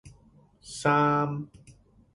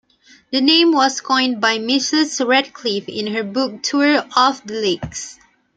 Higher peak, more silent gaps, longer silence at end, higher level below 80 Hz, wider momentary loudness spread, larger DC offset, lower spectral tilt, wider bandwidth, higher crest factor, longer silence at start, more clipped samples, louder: second, -10 dBFS vs 0 dBFS; neither; about the same, 0.45 s vs 0.45 s; second, -62 dBFS vs -56 dBFS; first, 19 LU vs 10 LU; neither; first, -6 dB/octave vs -2.5 dB/octave; first, 11.5 kHz vs 9.4 kHz; about the same, 20 dB vs 18 dB; second, 0.05 s vs 0.5 s; neither; second, -26 LUFS vs -17 LUFS